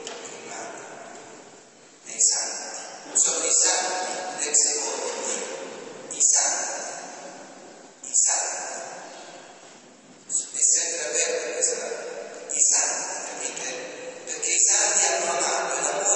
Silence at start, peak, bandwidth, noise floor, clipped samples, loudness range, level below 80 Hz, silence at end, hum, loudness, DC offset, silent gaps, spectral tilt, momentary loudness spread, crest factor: 0 s; -6 dBFS; 9.2 kHz; -50 dBFS; under 0.1%; 5 LU; -82 dBFS; 0 s; none; -22 LUFS; under 0.1%; none; 1.5 dB/octave; 21 LU; 20 dB